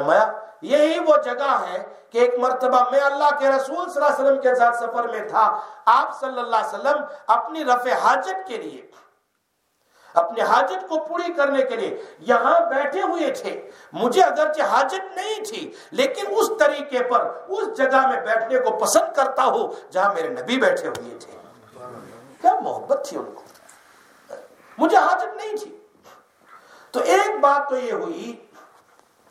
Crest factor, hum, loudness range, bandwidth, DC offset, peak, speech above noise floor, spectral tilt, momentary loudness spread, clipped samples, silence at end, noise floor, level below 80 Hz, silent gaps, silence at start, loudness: 20 dB; none; 5 LU; 15.5 kHz; under 0.1%; 0 dBFS; 50 dB; -2.5 dB/octave; 15 LU; under 0.1%; 0.95 s; -71 dBFS; -78 dBFS; none; 0 s; -20 LUFS